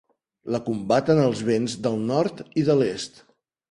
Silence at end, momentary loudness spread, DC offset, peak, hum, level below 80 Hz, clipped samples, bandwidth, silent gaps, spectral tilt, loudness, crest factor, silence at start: 0.6 s; 10 LU; under 0.1%; -6 dBFS; none; -60 dBFS; under 0.1%; 11 kHz; none; -6.5 dB/octave; -23 LUFS; 16 dB; 0.45 s